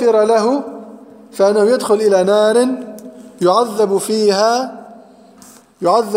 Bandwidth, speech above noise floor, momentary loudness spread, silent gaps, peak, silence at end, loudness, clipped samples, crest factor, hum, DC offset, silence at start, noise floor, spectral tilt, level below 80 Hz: 16 kHz; 30 dB; 19 LU; none; 0 dBFS; 0 s; -14 LUFS; under 0.1%; 14 dB; none; under 0.1%; 0 s; -43 dBFS; -4.5 dB/octave; -66 dBFS